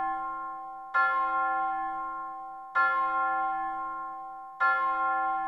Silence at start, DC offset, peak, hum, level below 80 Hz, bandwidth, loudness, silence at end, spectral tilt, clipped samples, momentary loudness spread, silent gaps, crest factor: 0 s; under 0.1%; -14 dBFS; none; -66 dBFS; 6 kHz; -29 LUFS; 0 s; -4 dB/octave; under 0.1%; 13 LU; none; 16 dB